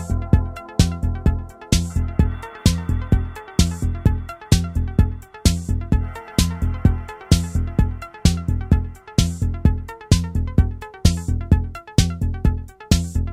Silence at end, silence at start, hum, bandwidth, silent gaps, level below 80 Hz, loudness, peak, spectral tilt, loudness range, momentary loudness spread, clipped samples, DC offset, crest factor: 0 s; 0 s; none; 15 kHz; none; -24 dBFS; -21 LUFS; -2 dBFS; -5.5 dB/octave; 1 LU; 4 LU; under 0.1%; under 0.1%; 18 dB